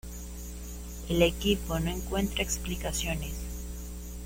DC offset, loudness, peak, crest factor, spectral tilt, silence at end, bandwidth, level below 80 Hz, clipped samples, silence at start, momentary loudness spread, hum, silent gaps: under 0.1%; -31 LUFS; -10 dBFS; 22 dB; -4 dB/octave; 0 s; 16.5 kHz; -38 dBFS; under 0.1%; 0.05 s; 15 LU; 60 Hz at -35 dBFS; none